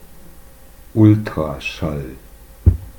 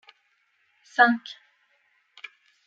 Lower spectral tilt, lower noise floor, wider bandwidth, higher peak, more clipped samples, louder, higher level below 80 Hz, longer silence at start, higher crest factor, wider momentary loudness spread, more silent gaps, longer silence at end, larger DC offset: first, -8 dB/octave vs -4 dB/octave; second, -41 dBFS vs -69 dBFS; first, 18.5 kHz vs 7.6 kHz; first, 0 dBFS vs -4 dBFS; neither; first, -18 LUFS vs -22 LUFS; first, -28 dBFS vs under -90 dBFS; second, 0.05 s vs 1 s; second, 18 dB vs 26 dB; second, 13 LU vs 25 LU; neither; second, 0.1 s vs 1.35 s; neither